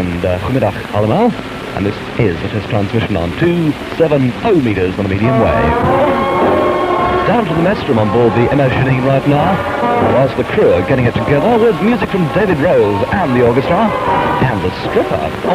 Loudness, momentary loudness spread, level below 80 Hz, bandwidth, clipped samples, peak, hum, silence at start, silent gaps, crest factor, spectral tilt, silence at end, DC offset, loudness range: -13 LUFS; 5 LU; -34 dBFS; 15.5 kHz; under 0.1%; 0 dBFS; none; 0 s; none; 12 dB; -7.5 dB/octave; 0 s; under 0.1%; 3 LU